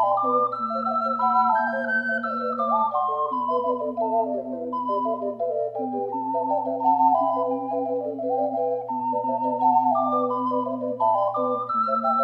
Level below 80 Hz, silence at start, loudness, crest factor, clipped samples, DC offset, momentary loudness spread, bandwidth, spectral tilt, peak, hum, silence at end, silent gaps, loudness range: -74 dBFS; 0 s; -24 LUFS; 14 dB; under 0.1%; under 0.1%; 7 LU; 5.4 kHz; -8 dB/octave; -10 dBFS; none; 0 s; none; 3 LU